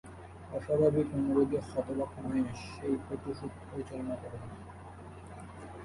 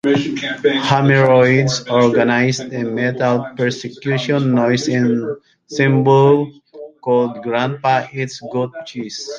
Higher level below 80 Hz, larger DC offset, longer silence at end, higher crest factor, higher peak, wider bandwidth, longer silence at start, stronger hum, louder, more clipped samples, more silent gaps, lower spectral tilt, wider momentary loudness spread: about the same, -54 dBFS vs -58 dBFS; neither; about the same, 0 s vs 0 s; first, 20 dB vs 14 dB; second, -14 dBFS vs -2 dBFS; first, 11.5 kHz vs 9 kHz; about the same, 0.05 s vs 0.05 s; neither; second, -34 LUFS vs -16 LUFS; neither; neither; first, -8 dB/octave vs -6 dB/octave; first, 20 LU vs 13 LU